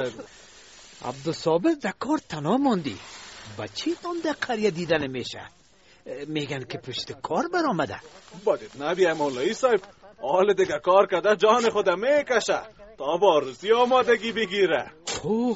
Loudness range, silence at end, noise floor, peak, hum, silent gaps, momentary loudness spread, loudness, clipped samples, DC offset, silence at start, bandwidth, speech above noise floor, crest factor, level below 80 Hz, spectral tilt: 7 LU; 0 s; -49 dBFS; -6 dBFS; none; none; 15 LU; -24 LUFS; under 0.1%; under 0.1%; 0 s; 8 kHz; 25 dB; 20 dB; -62 dBFS; -3 dB/octave